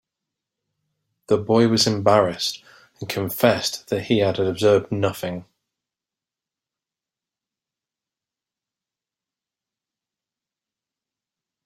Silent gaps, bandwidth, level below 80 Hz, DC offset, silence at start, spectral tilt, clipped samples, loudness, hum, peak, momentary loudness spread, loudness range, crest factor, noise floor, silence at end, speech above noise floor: none; 16 kHz; -62 dBFS; under 0.1%; 1.3 s; -5 dB/octave; under 0.1%; -20 LUFS; none; -2 dBFS; 13 LU; 7 LU; 22 dB; -89 dBFS; 6.2 s; 69 dB